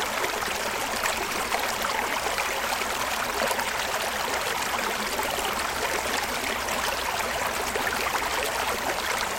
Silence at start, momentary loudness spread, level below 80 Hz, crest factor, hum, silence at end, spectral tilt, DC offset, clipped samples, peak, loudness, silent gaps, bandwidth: 0 s; 1 LU; -48 dBFS; 22 dB; none; 0 s; -1 dB/octave; under 0.1%; under 0.1%; -6 dBFS; -26 LUFS; none; 17 kHz